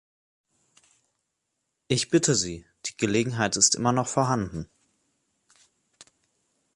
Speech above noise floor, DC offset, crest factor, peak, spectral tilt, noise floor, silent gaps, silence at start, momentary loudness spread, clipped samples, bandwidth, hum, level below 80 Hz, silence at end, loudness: 55 dB; under 0.1%; 22 dB; -6 dBFS; -3.5 dB/octave; -80 dBFS; none; 1.9 s; 15 LU; under 0.1%; 11.5 kHz; none; -56 dBFS; 2.1 s; -24 LUFS